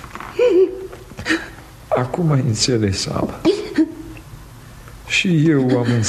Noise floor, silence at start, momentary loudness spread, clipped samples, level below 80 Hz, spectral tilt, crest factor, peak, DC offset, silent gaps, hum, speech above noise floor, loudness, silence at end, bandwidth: -39 dBFS; 0 s; 19 LU; under 0.1%; -44 dBFS; -5.5 dB/octave; 16 dB; -4 dBFS; under 0.1%; none; none; 22 dB; -18 LUFS; 0 s; 13.5 kHz